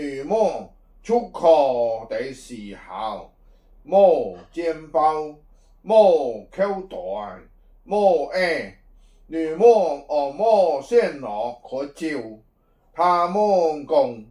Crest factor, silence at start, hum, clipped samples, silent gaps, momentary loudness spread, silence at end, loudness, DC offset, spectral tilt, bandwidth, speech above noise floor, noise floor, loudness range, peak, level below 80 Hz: 18 dB; 0 s; none; under 0.1%; none; 17 LU; 0.05 s; -21 LUFS; under 0.1%; -5.5 dB/octave; 11 kHz; 39 dB; -60 dBFS; 3 LU; -4 dBFS; -54 dBFS